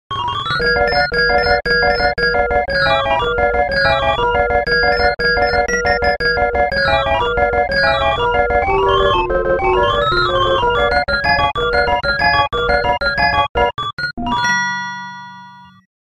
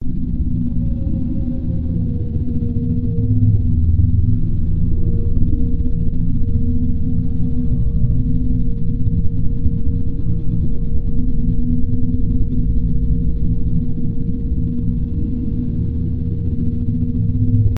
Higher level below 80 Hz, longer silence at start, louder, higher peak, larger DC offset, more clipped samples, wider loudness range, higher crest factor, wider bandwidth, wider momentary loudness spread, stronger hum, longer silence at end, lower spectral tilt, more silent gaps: second, -30 dBFS vs -20 dBFS; about the same, 0.1 s vs 0 s; first, -15 LUFS vs -20 LUFS; about the same, -2 dBFS vs 0 dBFS; first, 0.5% vs under 0.1%; neither; about the same, 1 LU vs 3 LU; about the same, 14 dB vs 14 dB; first, 11.5 kHz vs 0.9 kHz; about the same, 4 LU vs 5 LU; neither; first, 0.4 s vs 0 s; second, -4.5 dB/octave vs -13.5 dB/octave; first, 13.49-13.55 s, 13.93-13.97 s, 14.13-14.17 s vs none